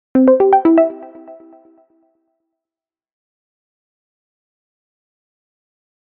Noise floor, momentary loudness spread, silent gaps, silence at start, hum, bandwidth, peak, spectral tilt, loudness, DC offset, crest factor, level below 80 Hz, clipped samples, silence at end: under -90 dBFS; 10 LU; none; 0.15 s; none; 3.3 kHz; 0 dBFS; -6.5 dB/octave; -12 LUFS; under 0.1%; 18 dB; -62 dBFS; under 0.1%; 4.7 s